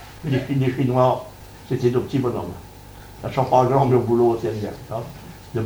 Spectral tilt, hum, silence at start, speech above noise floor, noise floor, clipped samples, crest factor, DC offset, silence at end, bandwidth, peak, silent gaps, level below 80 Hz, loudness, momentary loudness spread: -8 dB/octave; none; 0 s; 21 dB; -41 dBFS; under 0.1%; 18 dB; under 0.1%; 0 s; over 20 kHz; -4 dBFS; none; -48 dBFS; -21 LUFS; 22 LU